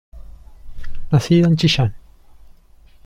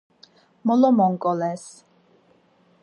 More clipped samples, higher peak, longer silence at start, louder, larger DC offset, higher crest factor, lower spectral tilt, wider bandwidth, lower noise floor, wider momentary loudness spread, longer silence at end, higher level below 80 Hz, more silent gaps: neither; about the same, -4 dBFS vs -6 dBFS; second, 0.15 s vs 0.65 s; first, -16 LUFS vs -21 LUFS; neither; about the same, 16 dB vs 18 dB; about the same, -6.5 dB/octave vs -7.5 dB/octave; about the same, 12 kHz vs 11 kHz; second, -47 dBFS vs -60 dBFS; first, 22 LU vs 17 LU; about the same, 1.1 s vs 1.15 s; first, -34 dBFS vs -78 dBFS; neither